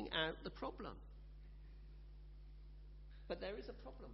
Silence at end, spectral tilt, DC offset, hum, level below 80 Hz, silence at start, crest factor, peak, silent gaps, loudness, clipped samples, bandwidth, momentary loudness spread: 0 s; -2 dB/octave; under 0.1%; 50 Hz at -55 dBFS; -56 dBFS; 0 s; 24 dB; -26 dBFS; none; -47 LUFS; under 0.1%; 5.6 kHz; 17 LU